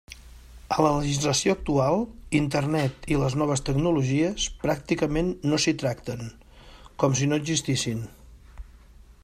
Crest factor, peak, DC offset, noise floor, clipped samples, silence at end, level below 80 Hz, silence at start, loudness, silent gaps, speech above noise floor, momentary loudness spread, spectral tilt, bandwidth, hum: 20 dB; -6 dBFS; under 0.1%; -50 dBFS; under 0.1%; 0.1 s; -44 dBFS; 0.1 s; -25 LUFS; none; 26 dB; 11 LU; -5 dB/octave; 14.5 kHz; none